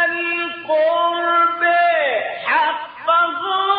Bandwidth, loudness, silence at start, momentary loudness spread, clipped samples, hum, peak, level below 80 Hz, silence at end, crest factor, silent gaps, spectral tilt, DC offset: 5 kHz; -17 LUFS; 0 s; 6 LU; under 0.1%; none; -4 dBFS; -74 dBFS; 0 s; 12 dB; none; 1.5 dB/octave; under 0.1%